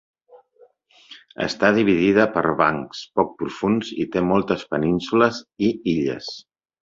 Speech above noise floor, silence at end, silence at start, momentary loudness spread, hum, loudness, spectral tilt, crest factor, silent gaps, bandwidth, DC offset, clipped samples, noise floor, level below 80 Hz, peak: 35 dB; 0.45 s; 0.35 s; 11 LU; none; -21 LUFS; -6.5 dB/octave; 20 dB; none; 7.6 kHz; under 0.1%; under 0.1%; -56 dBFS; -54 dBFS; -2 dBFS